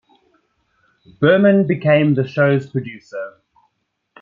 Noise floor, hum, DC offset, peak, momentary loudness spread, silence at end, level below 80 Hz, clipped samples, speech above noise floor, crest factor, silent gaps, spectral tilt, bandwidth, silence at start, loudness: -71 dBFS; none; under 0.1%; -2 dBFS; 18 LU; 0.95 s; -62 dBFS; under 0.1%; 56 dB; 18 dB; none; -9 dB/octave; 7.2 kHz; 1.2 s; -16 LUFS